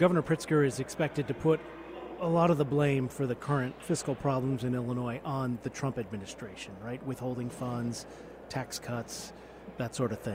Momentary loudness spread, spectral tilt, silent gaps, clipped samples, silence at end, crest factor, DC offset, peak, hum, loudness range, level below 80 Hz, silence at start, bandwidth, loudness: 15 LU; -6.5 dB/octave; none; under 0.1%; 0 s; 18 dB; under 0.1%; -12 dBFS; none; 8 LU; -60 dBFS; 0 s; 16 kHz; -32 LUFS